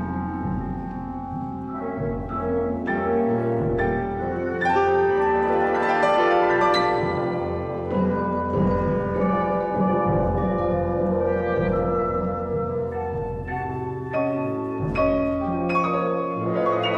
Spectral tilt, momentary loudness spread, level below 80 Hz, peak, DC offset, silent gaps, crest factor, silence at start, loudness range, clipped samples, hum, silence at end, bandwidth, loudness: -8 dB/octave; 9 LU; -40 dBFS; -8 dBFS; under 0.1%; none; 16 dB; 0 s; 5 LU; under 0.1%; none; 0 s; 8.8 kHz; -23 LUFS